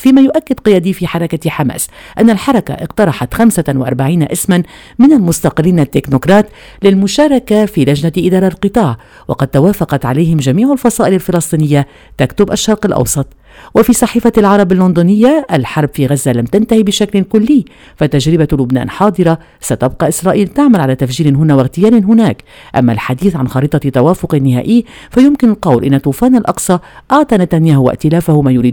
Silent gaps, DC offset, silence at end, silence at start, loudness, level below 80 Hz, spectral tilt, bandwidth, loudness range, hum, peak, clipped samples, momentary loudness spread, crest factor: none; under 0.1%; 0 s; 0 s; -11 LUFS; -36 dBFS; -6.5 dB/octave; 20 kHz; 2 LU; none; 0 dBFS; 0.6%; 7 LU; 10 dB